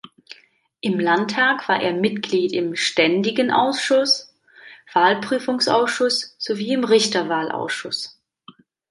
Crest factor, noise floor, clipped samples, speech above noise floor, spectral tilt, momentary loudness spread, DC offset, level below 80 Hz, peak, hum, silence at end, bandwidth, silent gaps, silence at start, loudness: 18 dB; -56 dBFS; under 0.1%; 37 dB; -3.5 dB/octave; 8 LU; under 0.1%; -70 dBFS; -2 dBFS; none; 0.8 s; 11.5 kHz; none; 0.3 s; -20 LUFS